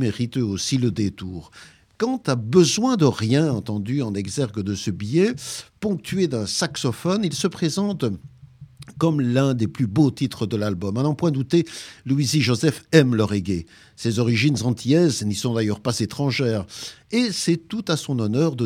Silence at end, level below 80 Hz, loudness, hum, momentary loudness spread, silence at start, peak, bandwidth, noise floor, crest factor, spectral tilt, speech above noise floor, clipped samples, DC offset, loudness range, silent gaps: 0 s; -56 dBFS; -22 LUFS; none; 9 LU; 0 s; 0 dBFS; 15.5 kHz; -44 dBFS; 22 dB; -5.5 dB/octave; 23 dB; under 0.1%; under 0.1%; 3 LU; none